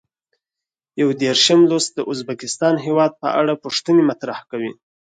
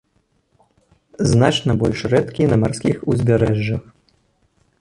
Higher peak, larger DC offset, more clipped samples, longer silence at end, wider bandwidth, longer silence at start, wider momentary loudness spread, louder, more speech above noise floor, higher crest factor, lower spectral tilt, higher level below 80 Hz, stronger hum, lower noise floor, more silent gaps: about the same, -2 dBFS vs -2 dBFS; neither; neither; second, 0.4 s vs 1 s; second, 9.4 kHz vs 11.5 kHz; second, 0.95 s vs 1.2 s; first, 14 LU vs 6 LU; about the same, -18 LUFS vs -18 LUFS; first, 70 dB vs 47 dB; about the same, 18 dB vs 16 dB; second, -4 dB/octave vs -6.5 dB/octave; second, -68 dBFS vs -42 dBFS; neither; first, -87 dBFS vs -64 dBFS; neither